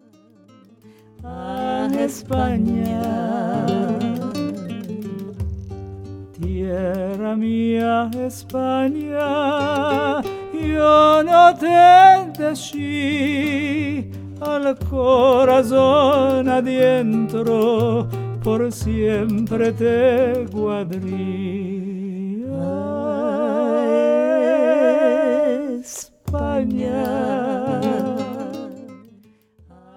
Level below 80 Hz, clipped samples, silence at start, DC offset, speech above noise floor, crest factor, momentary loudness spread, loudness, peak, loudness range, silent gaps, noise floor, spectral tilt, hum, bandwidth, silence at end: -42 dBFS; under 0.1%; 1.2 s; under 0.1%; 35 dB; 18 dB; 16 LU; -18 LUFS; -2 dBFS; 11 LU; none; -52 dBFS; -6.5 dB/octave; none; 17 kHz; 1 s